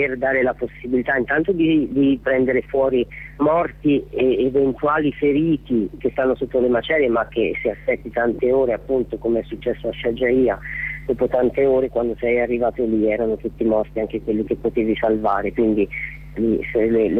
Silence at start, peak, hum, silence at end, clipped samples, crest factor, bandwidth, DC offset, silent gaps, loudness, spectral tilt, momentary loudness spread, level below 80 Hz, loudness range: 0 s; -8 dBFS; none; 0 s; under 0.1%; 12 dB; 4.1 kHz; under 0.1%; none; -20 LUFS; -9 dB/octave; 6 LU; -42 dBFS; 2 LU